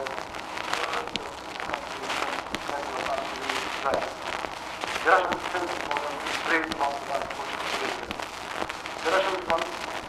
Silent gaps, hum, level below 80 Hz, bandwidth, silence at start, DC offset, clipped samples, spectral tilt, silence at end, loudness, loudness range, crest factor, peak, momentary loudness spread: none; none; -56 dBFS; 16 kHz; 0 s; under 0.1%; under 0.1%; -2.5 dB/octave; 0 s; -29 LUFS; 3 LU; 24 dB; -4 dBFS; 9 LU